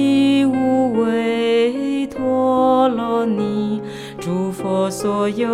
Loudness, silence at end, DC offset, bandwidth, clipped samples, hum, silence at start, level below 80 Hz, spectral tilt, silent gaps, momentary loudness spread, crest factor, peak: -18 LUFS; 0 s; under 0.1%; 14 kHz; under 0.1%; none; 0 s; -54 dBFS; -6 dB/octave; none; 8 LU; 14 dB; -4 dBFS